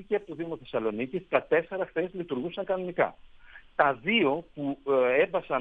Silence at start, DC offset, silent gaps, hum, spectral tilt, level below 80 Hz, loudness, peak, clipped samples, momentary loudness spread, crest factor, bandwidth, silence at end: 0 s; under 0.1%; none; none; -8 dB/octave; -62 dBFS; -28 LUFS; -6 dBFS; under 0.1%; 9 LU; 22 dB; 4.7 kHz; 0 s